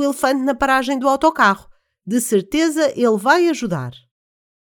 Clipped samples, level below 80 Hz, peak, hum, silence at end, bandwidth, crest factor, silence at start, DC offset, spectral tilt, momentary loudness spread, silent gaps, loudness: under 0.1%; -50 dBFS; 0 dBFS; none; 0.75 s; 19.5 kHz; 18 dB; 0 s; under 0.1%; -4.5 dB/octave; 9 LU; none; -17 LUFS